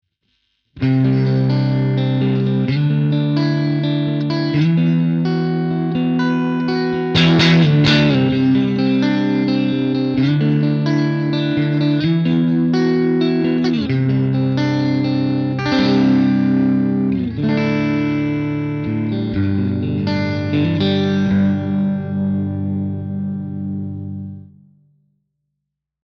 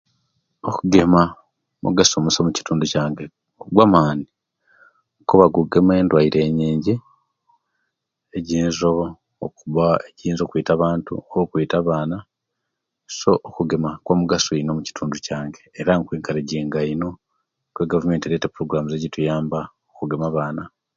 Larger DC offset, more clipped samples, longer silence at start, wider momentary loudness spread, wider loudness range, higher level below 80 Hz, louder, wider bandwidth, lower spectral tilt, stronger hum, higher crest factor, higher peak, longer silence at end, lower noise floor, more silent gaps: neither; neither; about the same, 0.75 s vs 0.65 s; second, 7 LU vs 14 LU; about the same, 5 LU vs 6 LU; about the same, -50 dBFS vs -48 dBFS; first, -17 LUFS vs -20 LUFS; about the same, 7 kHz vs 7.6 kHz; first, -8 dB/octave vs -5.5 dB/octave; neither; about the same, 16 dB vs 20 dB; about the same, 0 dBFS vs 0 dBFS; first, 1.65 s vs 0.3 s; about the same, -78 dBFS vs -79 dBFS; neither